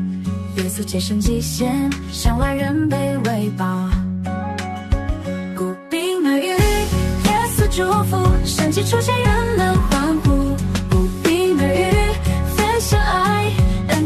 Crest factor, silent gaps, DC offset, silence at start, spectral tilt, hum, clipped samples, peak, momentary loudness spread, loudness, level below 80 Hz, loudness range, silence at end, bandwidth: 14 dB; none; under 0.1%; 0 s; -5.5 dB/octave; none; under 0.1%; -4 dBFS; 7 LU; -19 LUFS; -26 dBFS; 4 LU; 0 s; 14 kHz